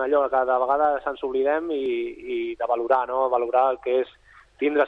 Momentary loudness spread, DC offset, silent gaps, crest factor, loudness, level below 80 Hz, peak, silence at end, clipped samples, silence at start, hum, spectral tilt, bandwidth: 8 LU; under 0.1%; none; 16 dB; -24 LUFS; -58 dBFS; -6 dBFS; 0 s; under 0.1%; 0 s; none; -6 dB/octave; 5.2 kHz